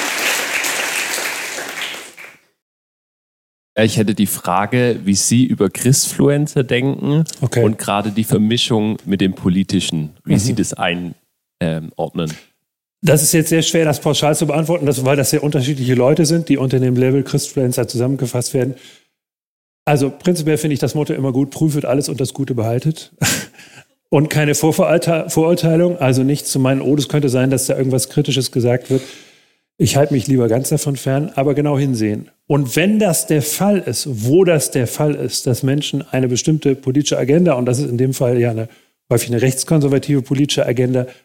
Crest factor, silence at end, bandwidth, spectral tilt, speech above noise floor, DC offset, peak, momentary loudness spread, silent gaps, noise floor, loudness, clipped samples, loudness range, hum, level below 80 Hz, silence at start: 16 dB; 0.1 s; 17 kHz; -5 dB/octave; 58 dB; under 0.1%; 0 dBFS; 7 LU; 2.62-3.76 s, 19.46-19.86 s; -74 dBFS; -16 LUFS; under 0.1%; 4 LU; none; -52 dBFS; 0 s